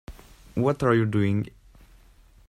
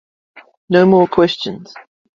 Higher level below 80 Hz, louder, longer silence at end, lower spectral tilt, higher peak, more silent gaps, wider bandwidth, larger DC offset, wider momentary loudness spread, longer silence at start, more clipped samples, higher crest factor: about the same, -50 dBFS vs -54 dBFS; second, -24 LUFS vs -14 LUFS; first, 1 s vs 0.35 s; about the same, -8 dB/octave vs -7 dB/octave; second, -8 dBFS vs 0 dBFS; second, none vs 0.57-0.68 s; first, 12.5 kHz vs 7.4 kHz; neither; second, 12 LU vs 15 LU; second, 0.1 s vs 0.35 s; neither; about the same, 18 dB vs 16 dB